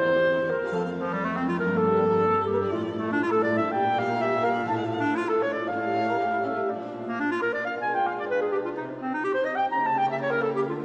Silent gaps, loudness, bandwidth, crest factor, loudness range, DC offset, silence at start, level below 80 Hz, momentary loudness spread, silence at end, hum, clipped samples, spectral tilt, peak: none; -26 LUFS; 8.4 kHz; 12 dB; 3 LU; under 0.1%; 0 s; -68 dBFS; 6 LU; 0 s; none; under 0.1%; -7.5 dB/octave; -12 dBFS